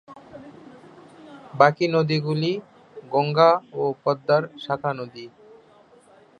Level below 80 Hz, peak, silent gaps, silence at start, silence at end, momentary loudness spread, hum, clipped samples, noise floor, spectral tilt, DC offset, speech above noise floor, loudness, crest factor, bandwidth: -70 dBFS; -2 dBFS; none; 0.1 s; 1.1 s; 24 LU; none; under 0.1%; -53 dBFS; -7 dB/octave; under 0.1%; 32 dB; -22 LUFS; 22 dB; 9.6 kHz